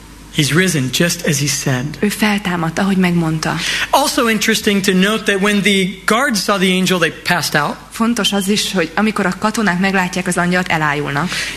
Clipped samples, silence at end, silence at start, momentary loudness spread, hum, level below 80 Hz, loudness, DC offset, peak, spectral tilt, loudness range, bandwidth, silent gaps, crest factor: under 0.1%; 0 s; 0 s; 4 LU; none; -44 dBFS; -15 LUFS; under 0.1%; 0 dBFS; -4 dB/octave; 2 LU; 14 kHz; none; 14 dB